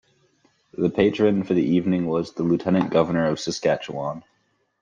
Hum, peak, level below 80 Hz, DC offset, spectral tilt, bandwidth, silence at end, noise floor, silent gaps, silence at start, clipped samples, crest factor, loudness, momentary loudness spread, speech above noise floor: none; -6 dBFS; -58 dBFS; under 0.1%; -6.5 dB/octave; 9.4 kHz; 0.6 s; -63 dBFS; none; 0.8 s; under 0.1%; 18 dB; -22 LUFS; 10 LU; 42 dB